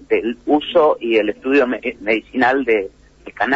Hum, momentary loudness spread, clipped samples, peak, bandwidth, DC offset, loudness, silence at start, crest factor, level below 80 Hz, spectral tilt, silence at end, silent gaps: none; 6 LU; under 0.1%; -4 dBFS; 7.6 kHz; under 0.1%; -17 LUFS; 0.1 s; 14 dB; -52 dBFS; -6 dB/octave; 0 s; none